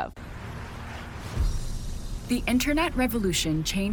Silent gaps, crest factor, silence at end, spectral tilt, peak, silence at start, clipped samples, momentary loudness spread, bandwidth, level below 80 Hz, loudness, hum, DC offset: none; 16 dB; 0 s; -4.5 dB/octave; -12 dBFS; 0 s; under 0.1%; 14 LU; 17.5 kHz; -34 dBFS; -28 LUFS; none; under 0.1%